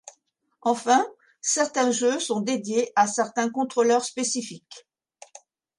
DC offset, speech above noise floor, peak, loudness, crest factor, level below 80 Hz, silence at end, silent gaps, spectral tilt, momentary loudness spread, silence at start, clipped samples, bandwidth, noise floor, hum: under 0.1%; 45 dB; -6 dBFS; -24 LUFS; 20 dB; -78 dBFS; 1 s; none; -2.5 dB/octave; 9 LU; 0.05 s; under 0.1%; 11.5 kHz; -68 dBFS; none